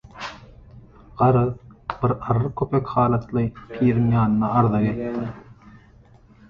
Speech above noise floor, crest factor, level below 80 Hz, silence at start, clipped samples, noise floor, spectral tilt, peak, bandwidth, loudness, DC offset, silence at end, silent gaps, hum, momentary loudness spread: 30 dB; 18 dB; -46 dBFS; 0.15 s; under 0.1%; -51 dBFS; -10 dB/octave; -4 dBFS; 6.8 kHz; -22 LUFS; under 0.1%; 0.75 s; none; none; 15 LU